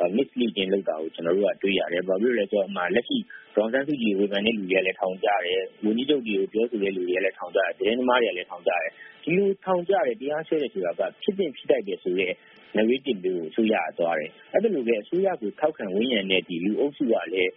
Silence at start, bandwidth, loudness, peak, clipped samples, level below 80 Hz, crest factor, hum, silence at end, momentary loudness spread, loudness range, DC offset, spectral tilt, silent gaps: 0 s; 3.9 kHz; -25 LUFS; -6 dBFS; under 0.1%; -68 dBFS; 18 dB; none; 0.05 s; 5 LU; 2 LU; under 0.1%; -3 dB/octave; none